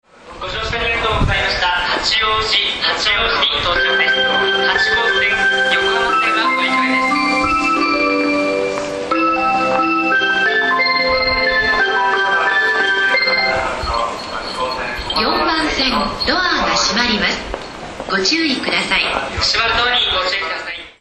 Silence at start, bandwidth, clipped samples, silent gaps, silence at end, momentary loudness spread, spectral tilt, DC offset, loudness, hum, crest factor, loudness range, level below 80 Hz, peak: 0.25 s; 12.5 kHz; under 0.1%; none; 0.1 s; 7 LU; -3 dB/octave; under 0.1%; -15 LUFS; none; 16 dB; 3 LU; -36 dBFS; 0 dBFS